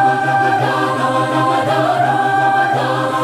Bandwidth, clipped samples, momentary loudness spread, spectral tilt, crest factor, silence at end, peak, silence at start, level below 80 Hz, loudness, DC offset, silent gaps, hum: 15 kHz; under 0.1%; 2 LU; -5.5 dB/octave; 12 dB; 0 s; -4 dBFS; 0 s; -64 dBFS; -15 LUFS; under 0.1%; none; none